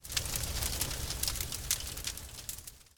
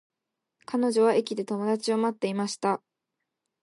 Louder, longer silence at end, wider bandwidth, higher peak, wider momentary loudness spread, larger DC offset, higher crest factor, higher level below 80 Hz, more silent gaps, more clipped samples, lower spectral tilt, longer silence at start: second, -35 LUFS vs -27 LUFS; second, 0.15 s vs 0.9 s; first, 18 kHz vs 11.5 kHz; about the same, -10 dBFS vs -12 dBFS; about the same, 9 LU vs 8 LU; neither; first, 28 dB vs 16 dB; first, -44 dBFS vs -82 dBFS; neither; neither; second, -1.5 dB/octave vs -5 dB/octave; second, 0 s vs 0.7 s